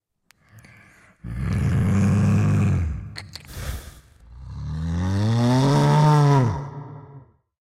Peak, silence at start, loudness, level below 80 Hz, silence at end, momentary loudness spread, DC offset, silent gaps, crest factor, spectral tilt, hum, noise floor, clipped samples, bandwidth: -8 dBFS; 1.25 s; -20 LUFS; -38 dBFS; 0.4 s; 21 LU; under 0.1%; none; 14 dB; -7.5 dB/octave; none; -61 dBFS; under 0.1%; 14.5 kHz